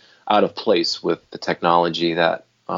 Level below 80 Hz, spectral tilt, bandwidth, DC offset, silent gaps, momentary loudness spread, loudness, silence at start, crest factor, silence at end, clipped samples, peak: -64 dBFS; -5 dB/octave; 7.6 kHz; under 0.1%; none; 8 LU; -20 LUFS; 0.25 s; 20 dB; 0 s; under 0.1%; 0 dBFS